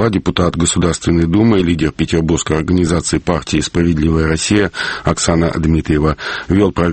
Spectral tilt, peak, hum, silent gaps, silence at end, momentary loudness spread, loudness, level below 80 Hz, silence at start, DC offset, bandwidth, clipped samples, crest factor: -5.5 dB/octave; 0 dBFS; none; none; 0 s; 4 LU; -14 LUFS; -28 dBFS; 0 s; under 0.1%; 8.8 kHz; under 0.1%; 14 dB